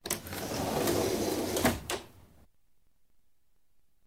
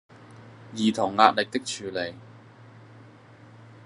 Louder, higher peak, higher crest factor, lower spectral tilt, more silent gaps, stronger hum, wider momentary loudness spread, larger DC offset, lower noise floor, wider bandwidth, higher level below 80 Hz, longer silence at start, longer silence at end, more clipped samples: second, -32 LUFS vs -24 LUFS; second, -12 dBFS vs 0 dBFS; about the same, 24 dB vs 28 dB; about the same, -4 dB/octave vs -4 dB/octave; neither; neither; second, 7 LU vs 22 LU; neither; first, -74 dBFS vs -50 dBFS; first, over 20 kHz vs 11.5 kHz; first, -54 dBFS vs -76 dBFS; second, 0.05 s vs 0.2 s; first, 1.85 s vs 0.2 s; neither